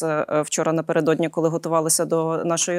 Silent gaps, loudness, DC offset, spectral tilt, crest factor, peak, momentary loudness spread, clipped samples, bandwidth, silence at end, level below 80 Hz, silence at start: none; -21 LUFS; under 0.1%; -4 dB/octave; 14 dB; -6 dBFS; 3 LU; under 0.1%; 16 kHz; 0 s; -70 dBFS; 0 s